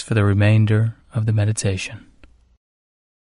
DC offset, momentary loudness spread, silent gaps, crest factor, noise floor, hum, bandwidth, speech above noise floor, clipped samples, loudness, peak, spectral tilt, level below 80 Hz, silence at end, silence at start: under 0.1%; 9 LU; none; 16 dB; -50 dBFS; none; 11 kHz; 32 dB; under 0.1%; -19 LUFS; -4 dBFS; -6.5 dB/octave; -50 dBFS; 1.35 s; 0 s